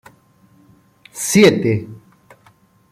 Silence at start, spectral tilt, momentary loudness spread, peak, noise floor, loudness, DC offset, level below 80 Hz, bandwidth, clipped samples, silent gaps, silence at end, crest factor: 1.15 s; -4.5 dB/octave; 25 LU; -2 dBFS; -53 dBFS; -15 LUFS; under 0.1%; -56 dBFS; 16 kHz; under 0.1%; none; 0.95 s; 18 dB